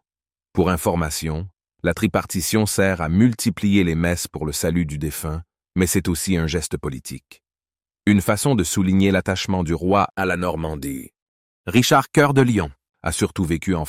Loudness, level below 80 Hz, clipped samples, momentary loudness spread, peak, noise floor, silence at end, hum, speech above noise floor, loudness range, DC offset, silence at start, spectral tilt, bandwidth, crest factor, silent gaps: -20 LUFS; -42 dBFS; under 0.1%; 13 LU; -4 dBFS; under -90 dBFS; 0 s; none; over 70 dB; 3 LU; under 0.1%; 0.55 s; -5 dB/octave; 16 kHz; 18 dB; 11.22-11.64 s, 12.89-12.93 s